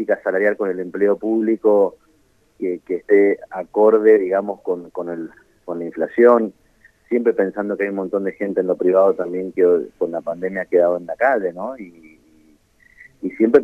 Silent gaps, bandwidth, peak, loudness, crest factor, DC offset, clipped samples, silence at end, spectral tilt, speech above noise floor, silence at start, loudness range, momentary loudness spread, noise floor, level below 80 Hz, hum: none; 3.6 kHz; 0 dBFS; -19 LUFS; 18 dB; under 0.1%; under 0.1%; 0 s; -9 dB/octave; 40 dB; 0 s; 3 LU; 14 LU; -58 dBFS; -64 dBFS; none